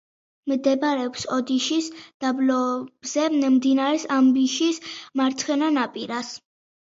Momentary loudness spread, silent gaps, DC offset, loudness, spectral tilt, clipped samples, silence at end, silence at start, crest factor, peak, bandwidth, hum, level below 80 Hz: 11 LU; 2.14-2.20 s; under 0.1%; -23 LUFS; -3 dB/octave; under 0.1%; 0.5 s; 0.45 s; 14 dB; -8 dBFS; 7.8 kHz; none; -72 dBFS